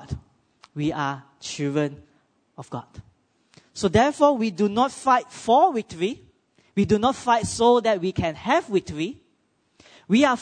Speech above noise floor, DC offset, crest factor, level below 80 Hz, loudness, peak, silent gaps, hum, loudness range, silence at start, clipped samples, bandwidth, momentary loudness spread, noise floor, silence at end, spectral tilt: 46 dB; under 0.1%; 18 dB; -52 dBFS; -22 LUFS; -6 dBFS; none; none; 9 LU; 0 s; under 0.1%; 9.6 kHz; 18 LU; -67 dBFS; 0 s; -5.5 dB/octave